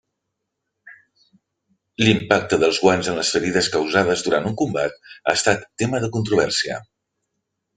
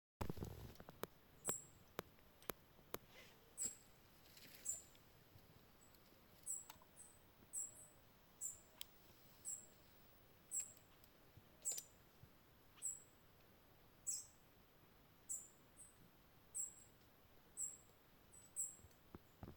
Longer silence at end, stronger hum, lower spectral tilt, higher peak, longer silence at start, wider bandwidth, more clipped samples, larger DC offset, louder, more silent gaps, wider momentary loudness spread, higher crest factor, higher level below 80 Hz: first, 0.95 s vs 0 s; neither; first, -4 dB/octave vs -2 dB/octave; first, 0 dBFS vs -22 dBFS; first, 0.85 s vs 0.2 s; second, 9.6 kHz vs 18 kHz; neither; neither; first, -20 LUFS vs -51 LUFS; neither; second, 8 LU vs 21 LU; second, 22 dB vs 34 dB; first, -56 dBFS vs -72 dBFS